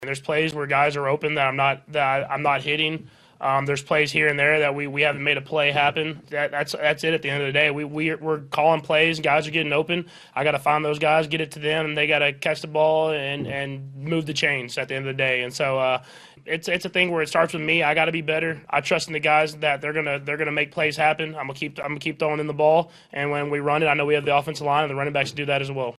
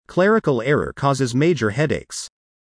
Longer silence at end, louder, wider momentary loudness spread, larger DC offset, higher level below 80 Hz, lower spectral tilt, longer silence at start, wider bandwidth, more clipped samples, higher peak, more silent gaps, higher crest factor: second, 0.05 s vs 0.35 s; second, -22 LUFS vs -19 LUFS; second, 8 LU vs 13 LU; neither; second, -62 dBFS vs -48 dBFS; second, -4.5 dB/octave vs -6 dB/octave; about the same, 0 s vs 0.1 s; first, 13 kHz vs 10.5 kHz; neither; about the same, -4 dBFS vs -6 dBFS; neither; first, 20 dB vs 14 dB